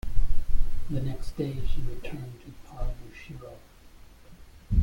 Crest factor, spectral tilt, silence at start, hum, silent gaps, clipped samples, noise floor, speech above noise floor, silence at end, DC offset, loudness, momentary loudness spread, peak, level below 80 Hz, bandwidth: 16 dB; -7.5 dB/octave; 0.05 s; none; none; under 0.1%; -50 dBFS; 21 dB; 0 s; under 0.1%; -36 LUFS; 21 LU; -8 dBFS; -30 dBFS; 5.2 kHz